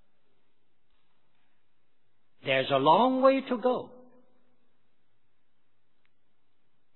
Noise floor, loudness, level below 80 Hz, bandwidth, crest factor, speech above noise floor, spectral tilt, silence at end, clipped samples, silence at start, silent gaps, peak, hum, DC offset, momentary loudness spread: -79 dBFS; -25 LUFS; -84 dBFS; 4.3 kHz; 22 dB; 54 dB; -8.5 dB/octave; 3.1 s; under 0.1%; 2.45 s; none; -8 dBFS; none; 0.2%; 10 LU